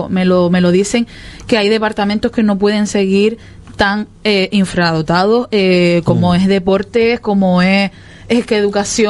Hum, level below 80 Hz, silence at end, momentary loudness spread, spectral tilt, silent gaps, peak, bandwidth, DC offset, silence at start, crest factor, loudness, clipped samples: none; -40 dBFS; 0 s; 5 LU; -5.5 dB/octave; none; 0 dBFS; 11.5 kHz; under 0.1%; 0 s; 12 dB; -13 LUFS; under 0.1%